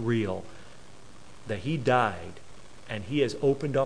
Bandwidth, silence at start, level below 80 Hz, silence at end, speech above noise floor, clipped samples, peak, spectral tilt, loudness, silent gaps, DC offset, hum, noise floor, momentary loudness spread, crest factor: 10.5 kHz; 0 s; -58 dBFS; 0 s; 24 dB; under 0.1%; -8 dBFS; -6.5 dB/octave; -28 LUFS; none; 0.8%; none; -52 dBFS; 23 LU; 20 dB